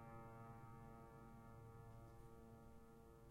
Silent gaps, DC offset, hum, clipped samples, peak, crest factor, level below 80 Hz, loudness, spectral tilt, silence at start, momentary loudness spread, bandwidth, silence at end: none; under 0.1%; none; under 0.1%; -46 dBFS; 14 dB; -70 dBFS; -62 LUFS; -7.5 dB/octave; 0 s; 6 LU; 16 kHz; 0 s